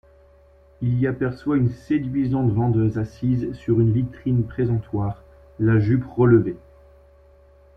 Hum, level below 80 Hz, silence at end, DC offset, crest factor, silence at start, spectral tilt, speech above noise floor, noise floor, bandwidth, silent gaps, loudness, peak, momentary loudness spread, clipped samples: none; -46 dBFS; 1.2 s; under 0.1%; 18 dB; 0.8 s; -11 dB/octave; 32 dB; -52 dBFS; 5.6 kHz; none; -22 LUFS; -4 dBFS; 9 LU; under 0.1%